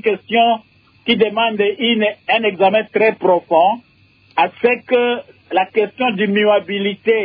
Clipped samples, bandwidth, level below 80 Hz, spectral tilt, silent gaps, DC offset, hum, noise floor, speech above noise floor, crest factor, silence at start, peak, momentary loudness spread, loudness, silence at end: under 0.1%; 5.2 kHz; -64 dBFS; -8 dB/octave; none; under 0.1%; none; -36 dBFS; 20 dB; 14 dB; 0 s; -2 dBFS; 6 LU; -16 LUFS; 0 s